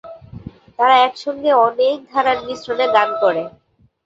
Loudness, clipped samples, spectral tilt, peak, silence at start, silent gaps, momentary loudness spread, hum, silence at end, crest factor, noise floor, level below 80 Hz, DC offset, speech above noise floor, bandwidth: -16 LUFS; under 0.1%; -4.5 dB/octave; -2 dBFS; 0.05 s; none; 22 LU; none; 0.55 s; 16 dB; -36 dBFS; -54 dBFS; under 0.1%; 20 dB; 7.8 kHz